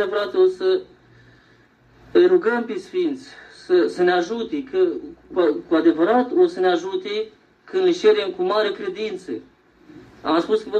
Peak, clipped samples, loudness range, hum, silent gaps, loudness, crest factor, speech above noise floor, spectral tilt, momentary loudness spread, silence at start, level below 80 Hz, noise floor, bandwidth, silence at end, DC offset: -4 dBFS; under 0.1%; 3 LU; none; none; -20 LUFS; 16 dB; 35 dB; -5.5 dB/octave; 12 LU; 0 s; -62 dBFS; -54 dBFS; 8.6 kHz; 0 s; under 0.1%